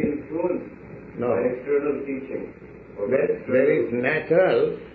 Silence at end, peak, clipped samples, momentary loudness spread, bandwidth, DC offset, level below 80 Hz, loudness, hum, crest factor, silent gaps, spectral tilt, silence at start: 0 s; -8 dBFS; under 0.1%; 19 LU; 4.7 kHz; under 0.1%; -56 dBFS; -23 LUFS; none; 16 dB; none; -5.5 dB/octave; 0 s